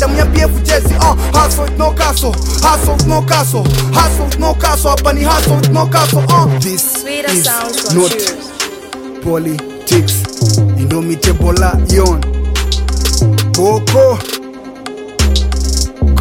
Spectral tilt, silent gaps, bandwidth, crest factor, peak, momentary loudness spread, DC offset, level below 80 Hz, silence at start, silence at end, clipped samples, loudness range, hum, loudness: -4.5 dB/octave; none; 17 kHz; 12 dB; 0 dBFS; 8 LU; under 0.1%; -16 dBFS; 0 s; 0 s; under 0.1%; 3 LU; none; -12 LUFS